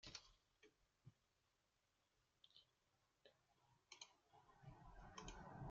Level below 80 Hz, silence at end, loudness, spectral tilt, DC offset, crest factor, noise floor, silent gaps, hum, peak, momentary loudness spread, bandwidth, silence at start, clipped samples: -74 dBFS; 0 s; -62 LUFS; -3.5 dB/octave; under 0.1%; 28 dB; -87 dBFS; none; none; -36 dBFS; 8 LU; 7.4 kHz; 0 s; under 0.1%